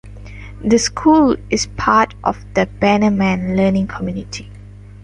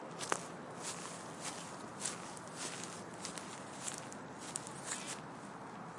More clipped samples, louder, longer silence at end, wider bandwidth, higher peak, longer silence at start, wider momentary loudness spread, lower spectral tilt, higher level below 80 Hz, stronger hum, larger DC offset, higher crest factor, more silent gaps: neither; first, -16 LUFS vs -44 LUFS; first, 0.45 s vs 0 s; about the same, 11.5 kHz vs 11.5 kHz; first, 0 dBFS vs -14 dBFS; about the same, 0.05 s vs 0 s; first, 16 LU vs 7 LU; first, -5 dB/octave vs -2.5 dB/octave; first, -36 dBFS vs -80 dBFS; first, 50 Hz at -35 dBFS vs none; neither; second, 16 dB vs 32 dB; neither